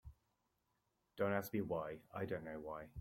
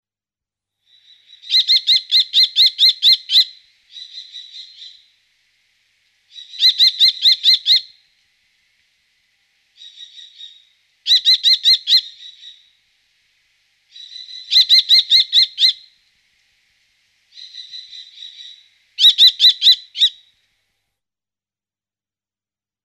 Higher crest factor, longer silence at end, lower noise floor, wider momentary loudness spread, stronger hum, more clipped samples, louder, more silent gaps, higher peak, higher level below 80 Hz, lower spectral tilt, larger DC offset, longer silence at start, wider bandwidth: first, 22 dB vs 16 dB; second, 0 s vs 2.75 s; second, -84 dBFS vs under -90 dBFS; second, 9 LU vs 25 LU; neither; neither; second, -44 LUFS vs -11 LUFS; neither; second, -24 dBFS vs -2 dBFS; first, -70 dBFS vs -82 dBFS; first, -7 dB/octave vs 7 dB/octave; neither; second, 0.05 s vs 1.45 s; about the same, 16.5 kHz vs 15.5 kHz